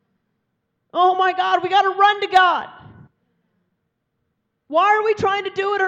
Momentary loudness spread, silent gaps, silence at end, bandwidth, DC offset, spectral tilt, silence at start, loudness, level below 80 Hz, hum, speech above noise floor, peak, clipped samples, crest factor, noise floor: 8 LU; none; 0 s; 8.4 kHz; under 0.1%; -4 dB/octave; 0.95 s; -17 LUFS; -62 dBFS; none; 56 dB; -2 dBFS; under 0.1%; 18 dB; -73 dBFS